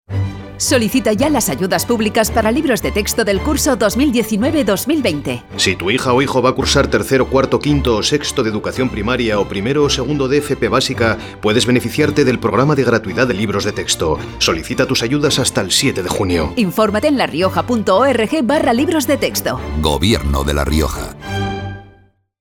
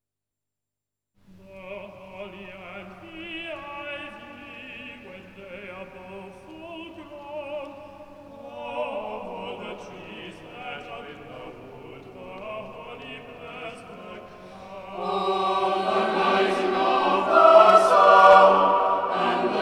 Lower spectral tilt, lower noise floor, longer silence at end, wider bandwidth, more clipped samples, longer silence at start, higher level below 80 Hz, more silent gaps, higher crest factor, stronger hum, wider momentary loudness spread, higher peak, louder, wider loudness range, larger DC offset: about the same, -4.5 dB/octave vs -4.5 dB/octave; second, -50 dBFS vs -88 dBFS; first, 0.55 s vs 0 s; first, over 20 kHz vs 12 kHz; neither; second, 0.1 s vs 1.55 s; first, -32 dBFS vs -62 dBFS; neither; second, 14 dB vs 22 dB; neither; second, 5 LU vs 27 LU; about the same, 0 dBFS vs -2 dBFS; first, -15 LUFS vs -19 LUFS; second, 1 LU vs 23 LU; neither